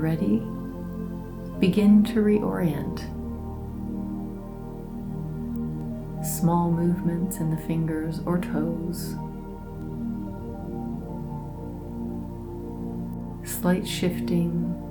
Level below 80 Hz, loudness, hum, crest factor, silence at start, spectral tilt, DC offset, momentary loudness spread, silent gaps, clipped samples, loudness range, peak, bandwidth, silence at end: -42 dBFS; -27 LUFS; none; 18 dB; 0 s; -7 dB/octave; under 0.1%; 13 LU; none; under 0.1%; 10 LU; -8 dBFS; 19 kHz; 0 s